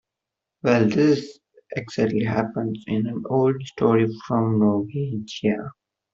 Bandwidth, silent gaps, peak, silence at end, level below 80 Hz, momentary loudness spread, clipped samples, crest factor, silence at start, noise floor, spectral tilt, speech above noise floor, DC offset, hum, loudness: 7.6 kHz; none; -4 dBFS; 0.45 s; -60 dBFS; 10 LU; under 0.1%; 20 dB; 0.65 s; -85 dBFS; -7.5 dB/octave; 64 dB; under 0.1%; none; -22 LUFS